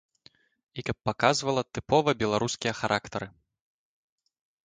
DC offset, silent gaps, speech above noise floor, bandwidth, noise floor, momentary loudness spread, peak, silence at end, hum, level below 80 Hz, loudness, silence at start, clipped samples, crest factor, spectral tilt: under 0.1%; none; 34 dB; 9.6 kHz; -61 dBFS; 13 LU; -8 dBFS; 1.4 s; none; -58 dBFS; -28 LUFS; 0.75 s; under 0.1%; 22 dB; -4.5 dB/octave